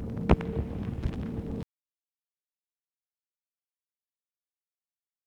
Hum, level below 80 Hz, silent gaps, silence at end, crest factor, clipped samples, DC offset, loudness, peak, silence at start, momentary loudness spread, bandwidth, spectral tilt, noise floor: none; -40 dBFS; none; 3.65 s; 30 dB; under 0.1%; under 0.1%; -32 LUFS; -4 dBFS; 0 s; 12 LU; 7.4 kHz; -9 dB/octave; under -90 dBFS